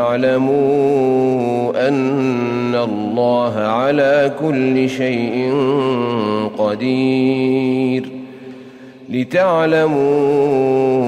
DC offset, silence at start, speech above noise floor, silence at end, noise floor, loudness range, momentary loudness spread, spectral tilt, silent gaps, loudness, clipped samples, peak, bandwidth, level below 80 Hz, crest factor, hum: under 0.1%; 0 s; 22 dB; 0 s; -37 dBFS; 2 LU; 5 LU; -7.5 dB/octave; none; -16 LUFS; under 0.1%; -4 dBFS; 10 kHz; -58 dBFS; 12 dB; none